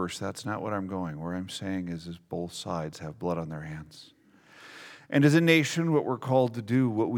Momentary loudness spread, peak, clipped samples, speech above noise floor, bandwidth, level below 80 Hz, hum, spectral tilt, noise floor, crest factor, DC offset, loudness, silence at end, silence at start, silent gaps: 18 LU; -6 dBFS; under 0.1%; 27 dB; 17.5 kHz; -62 dBFS; none; -6 dB/octave; -55 dBFS; 22 dB; under 0.1%; -28 LUFS; 0 s; 0 s; none